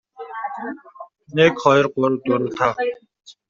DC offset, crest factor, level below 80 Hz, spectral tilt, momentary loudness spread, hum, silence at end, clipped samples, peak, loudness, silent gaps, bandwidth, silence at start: under 0.1%; 18 dB; -60 dBFS; -4 dB/octave; 17 LU; none; 0.2 s; under 0.1%; -2 dBFS; -19 LUFS; none; 7.4 kHz; 0.2 s